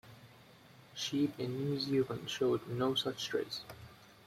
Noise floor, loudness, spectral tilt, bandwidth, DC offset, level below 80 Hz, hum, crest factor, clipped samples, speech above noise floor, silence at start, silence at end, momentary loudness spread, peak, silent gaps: -59 dBFS; -36 LUFS; -5 dB/octave; 16 kHz; under 0.1%; -70 dBFS; none; 16 dB; under 0.1%; 24 dB; 0.05 s; 0.15 s; 15 LU; -20 dBFS; none